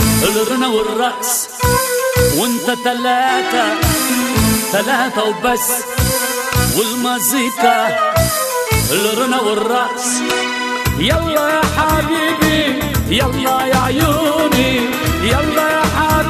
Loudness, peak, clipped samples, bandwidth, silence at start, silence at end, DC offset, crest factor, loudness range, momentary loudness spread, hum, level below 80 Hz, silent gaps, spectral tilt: -14 LUFS; 0 dBFS; under 0.1%; 14 kHz; 0 s; 0 s; under 0.1%; 14 dB; 1 LU; 3 LU; none; -30 dBFS; none; -3.5 dB/octave